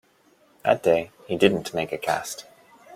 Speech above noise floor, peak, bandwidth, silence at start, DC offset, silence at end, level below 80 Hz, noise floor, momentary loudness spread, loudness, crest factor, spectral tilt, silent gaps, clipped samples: 37 dB; -4 dBFS; 16.5 kHz; 0.65 s; under 0.1%; 0 s; -62 dBFS; -60 dBFS; 11 LU; -24 LUFS; 22 dB; -4.5 dB/octave; none; under 0.1%